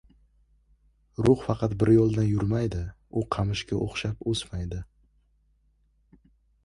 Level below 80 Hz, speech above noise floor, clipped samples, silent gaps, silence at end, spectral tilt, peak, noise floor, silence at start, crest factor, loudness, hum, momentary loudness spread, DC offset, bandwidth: -44 dBFS; 41 dB; under 0.1%; none; 1.8 s; -7 dB/octave; -6 dBFS; -66 dBFS; 1.2 s; 20 dB; -26 LUFS; none; 14 LU; under 0.1%; 11 kHz